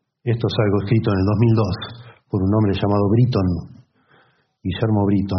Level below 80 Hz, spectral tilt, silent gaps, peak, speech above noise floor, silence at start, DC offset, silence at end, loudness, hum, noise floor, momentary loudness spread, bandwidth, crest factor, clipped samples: -50 dBFS; -7.5 dB/octave; none; -4 dBFS; 40 dB; 0.25 s; under 0.1%; 0 s; -19 LUFS; none; -58 dBFS; 11 LU; 6.2 kHz; 16 dB; under 0.1%